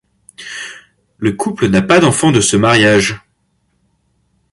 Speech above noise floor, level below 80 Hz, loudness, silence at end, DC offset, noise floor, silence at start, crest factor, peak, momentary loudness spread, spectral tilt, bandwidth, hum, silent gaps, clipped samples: 51 dB; -44 dBFS; -12 LUFS; 1.35 s; under 0.1%; -62 dBFS; 0.4 s; 14 dB; 0 dBFS; 19 LU; -4.5 dB/octave; 11.5 kHz; none; none; under 0.1%